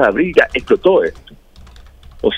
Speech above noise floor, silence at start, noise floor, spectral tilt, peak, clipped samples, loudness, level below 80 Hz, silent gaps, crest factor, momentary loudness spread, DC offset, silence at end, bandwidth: 26 dB; 0 s; -40 dBFS; -6 dB/octave; 0 dBFS; under 0.1%; -14 LUFS; -40 dBFS; none; 16 dB; 8 LU; under 0.1%; 0 s; 9.6 kHz